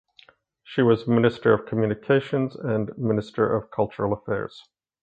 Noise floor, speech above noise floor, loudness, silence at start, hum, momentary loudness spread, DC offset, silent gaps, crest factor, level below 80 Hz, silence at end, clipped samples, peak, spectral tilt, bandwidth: -56 dBFS; 33 dB; -24 LUFS; 0.7 s; none; 8 LU; under 0.1%; none; 20 dB; -56 dBFS; 0.45 s; under 0.1%; -4 dBFS; -9 dB/octave; 7.8 kHz